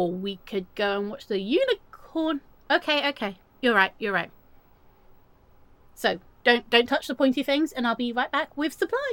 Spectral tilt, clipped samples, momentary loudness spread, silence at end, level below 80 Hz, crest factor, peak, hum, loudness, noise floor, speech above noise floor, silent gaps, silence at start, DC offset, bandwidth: -4.5 dB/octave; under 0.1%; 11 LU; 0 s; -60 dBFS; 22 dB; -4 dBFS; none; -25 LUFS; -56 dBFS; 31 dB; none; 0 s; under 0.1%; 17.5 kHz